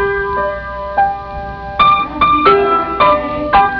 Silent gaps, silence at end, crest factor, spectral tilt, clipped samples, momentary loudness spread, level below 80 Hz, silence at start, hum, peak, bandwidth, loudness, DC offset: none; 0 s; 12 dB; -7 dB/octave; under 0.1%; 13 LU; -34 dBFS; 0 s; none; 0 dBFS; 5.4 kHz; -13 LUFS; under 0.1%